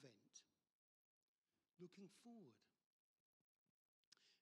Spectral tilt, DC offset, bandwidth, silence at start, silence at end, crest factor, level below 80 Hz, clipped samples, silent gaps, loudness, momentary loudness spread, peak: -4.5 dB/octave; under 0.1%; 10.5 kHz; 0 s; 0 s; 20 dB; under -90 dBFS; under 0.1%; 0.72-1.42 s, 2.86-4.12 s; -66 LUFS; 5 LU; -50 dBFS